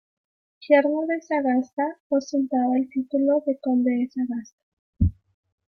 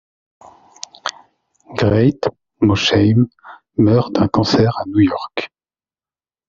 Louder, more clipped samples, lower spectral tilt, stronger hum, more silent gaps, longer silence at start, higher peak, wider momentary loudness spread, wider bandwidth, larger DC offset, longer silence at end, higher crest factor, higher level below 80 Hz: second, -24 LUFS vs -16 LUFS; neither; first, -8 dB/octave vs -5.5 dB/octave; neither; first, 1.73-1.77 s, 2.00-2.10 s, 4.53-4.93 s vs none; second, 0.6 s vs 1.05 s; second, -6 dBFS vs 0 dBFS; second, 8 LU vs 14 LU; second, 6.6 kHz vs 7.6 kHz; neither; second, 0.65 s vs 1.05 s; about the same, 18 dB vs 18 dB; about the same, -44 dBFS vs -48 dBFS